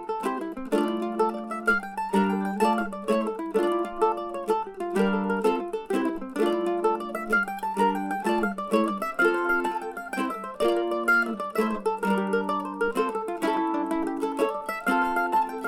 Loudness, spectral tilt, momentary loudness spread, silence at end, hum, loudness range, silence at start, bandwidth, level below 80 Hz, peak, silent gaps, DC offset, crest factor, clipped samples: -26 LUFS; -6 dB/octave; 5 LU; 0 s; none; 1 LU; 0 s; 16.5 kHz; -56 dBFS; -10 dBFS; none; under 0.1%; 16 dB; under 0.1%